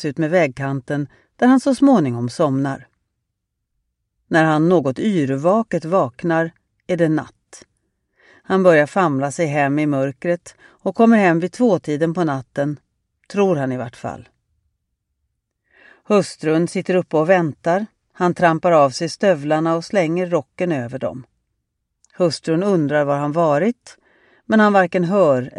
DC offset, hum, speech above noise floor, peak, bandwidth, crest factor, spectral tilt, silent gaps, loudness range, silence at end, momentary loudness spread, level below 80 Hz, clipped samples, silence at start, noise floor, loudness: under 0.1%; none; 59 dB; -2 dBFS; 11 kHz; 18 dB; -7 dB/octave; none; 6 LU; 0 s; 11 LU; -62 dBFS; under 0.1%; 0 s; -77 dBFS; -18 LUFS